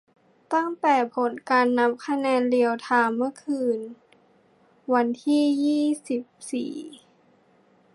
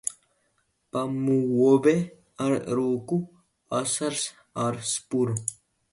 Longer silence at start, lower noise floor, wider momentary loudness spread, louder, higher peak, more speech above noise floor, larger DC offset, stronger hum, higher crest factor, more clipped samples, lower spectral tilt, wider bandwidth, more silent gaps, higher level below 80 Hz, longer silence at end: first, 0.5 s vs 0.05 s; second, -60 dBFS vs -72 dBFS; about the same, 10 LU vs 12 LU; about the same, -24 LUFS vs -26 LUFS; about the same, -8 dBFS vs -8 dBFS; second, 37 dB vs 47 dB; neither; neither; about the same, 18 dB vs 18 dB; neither; about the same, -4.5 dB/octave vs -5 dB/octave; about the same, 11.5 kHz vs 11.5 kHz; neither; second, -82 dBFS vs -66 dBFS; first, 1 s vs 0.4 s